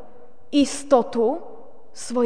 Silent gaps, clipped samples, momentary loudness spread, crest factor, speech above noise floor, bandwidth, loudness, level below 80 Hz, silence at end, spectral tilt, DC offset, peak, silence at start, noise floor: none; under 0.1%; 13 LU; 20 dB; 29 dB; 10 kHz; -22 LUFS; -58 dBFS; 0 s; -4 dB/octave; 2%; -2 dBFS; 0.55 s; -50 dBFS